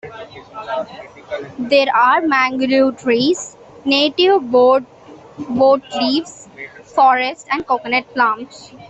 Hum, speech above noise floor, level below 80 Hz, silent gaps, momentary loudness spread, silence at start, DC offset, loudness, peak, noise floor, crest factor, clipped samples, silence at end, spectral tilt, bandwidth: none; 20 dB; -58 dBFS; none; 20 LU; 0.05 s; under 0.1%; -16 LUFS; -2 dBFS; -36 dBFS; 14 dB; under 0.1%; 0.05 s; -3.5 dB/octave; 8.2 kHz